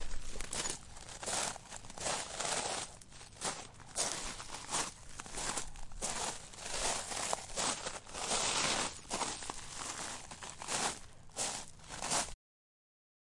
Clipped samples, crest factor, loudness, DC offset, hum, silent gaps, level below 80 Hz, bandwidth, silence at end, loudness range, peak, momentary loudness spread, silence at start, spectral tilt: under 0.1%; 24 dB; -38 LUFS; under 0.1%; none; none; -52 dBFS; 11.5 kHz; 1 s; 4 LU; -14 dBFS; 12 LU; 0 s; -1 dB/octave